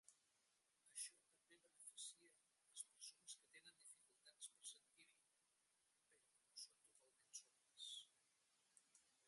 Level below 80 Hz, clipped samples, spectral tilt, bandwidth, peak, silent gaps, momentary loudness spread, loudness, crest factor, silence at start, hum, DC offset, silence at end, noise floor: under -90 dBFS; under 0.1%; 3 dB/octave; 11.5 kHz; -36 dBFS; none; 11 LU; -59 LUFS; 30 dB; 0.05 s; none; under 0.1%; 0 s; -86 dBFS